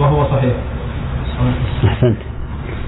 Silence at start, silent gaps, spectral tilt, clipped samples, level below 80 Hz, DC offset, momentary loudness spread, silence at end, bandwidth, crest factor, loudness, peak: 0 s; none; -12 dB/octave; under 0.1%; -24 dBFS; under 0.1%; 11 LU; 0 s; 4.1 kHz; 14 dB; -18 LUFS; -2 dBFS